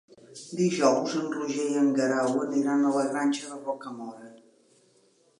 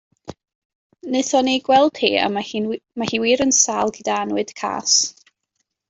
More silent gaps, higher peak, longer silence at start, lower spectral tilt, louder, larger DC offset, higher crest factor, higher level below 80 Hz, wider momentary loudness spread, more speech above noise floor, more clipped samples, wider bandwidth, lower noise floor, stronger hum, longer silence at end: second, none vs 0.55-0.90 s; second, -8 dBFS vs -2 dBFS; about the same, 0.3 s vs 0.25 s; first, -5 dB/octave vs -2 dB/octave; second, -27 LUFS vs -19 LUFS; neither; about the same, 20 dB vs 18 dB; second, -82 dBFS vs -60 dBFS; first, 16 LU vs 10 LU; second, 37 dB vs 55 dB; neither; first, 11 kHz vs 8.2 kHz; second, -64 dBFS vs -74 dBFS; neither; first, 1.05 s vs 0.8 s